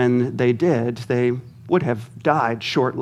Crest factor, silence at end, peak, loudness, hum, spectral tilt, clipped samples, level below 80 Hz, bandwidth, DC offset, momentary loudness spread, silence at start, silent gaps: 18 dB; 0 s; -2 dBFS; -21 LUFS; none; -7 dB/octave; under 0.1%; -62 dBFS; 11.5 kHz; under 0.1%; 4 LU; 0 s; none